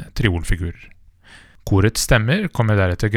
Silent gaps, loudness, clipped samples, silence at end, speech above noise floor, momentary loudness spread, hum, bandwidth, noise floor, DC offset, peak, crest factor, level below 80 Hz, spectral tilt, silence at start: none; -19 LUFS; under 0.1%; 0 s; 29 dB; 9 LU; none; 16.5 kHz; -46 dBFS; under 0.1%; 0 dBFS; 18 dB; -30 dBFS; -5.5 dB/octave; 0 s